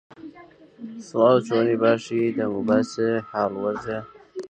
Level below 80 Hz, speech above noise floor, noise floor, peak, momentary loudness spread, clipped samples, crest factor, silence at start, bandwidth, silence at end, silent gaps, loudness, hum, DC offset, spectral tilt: -64 dBFS; 27 dB; -49 dBFS; -4 dBFS; 20 LU; under 0.1%; 18 dB; 0.2 s; 9 kHz; 0.05 s; none; -23 LUFS; none; under 0.1%; -6.5 dB/octave